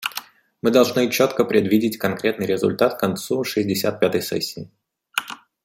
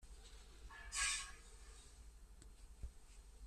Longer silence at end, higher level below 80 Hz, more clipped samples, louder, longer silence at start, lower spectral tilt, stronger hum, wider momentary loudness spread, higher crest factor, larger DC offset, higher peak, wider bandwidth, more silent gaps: first, 0.3 s vs 0 s; about the same, -62 dBFS vs -58 dBFS; neither; first, -21 LUFS vs -43 LUFS; about the same, 0 s vs 0 s; first, -4.5 dB/octave vs 0.5 dB/octave; neither; second, 10 LU vs 24 LU; about the same, 20 dB vs 24 dB; neither; first, -2 dBFS vs -26 dBFS; first, 16.5 kHz vs 13.5 kHz; neither